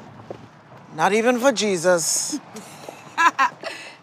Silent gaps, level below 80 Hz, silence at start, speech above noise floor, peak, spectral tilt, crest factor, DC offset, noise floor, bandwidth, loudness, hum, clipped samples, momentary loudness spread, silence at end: none; -74 dBFS; 0 s; 25 dB; -4 dBFS; -2.5 dB/octave; 20 dB; under 0.1%; -45 dBFS; 16 kHz; -20 LUFS; none; under 0.1%; 21 LU; 0.1 s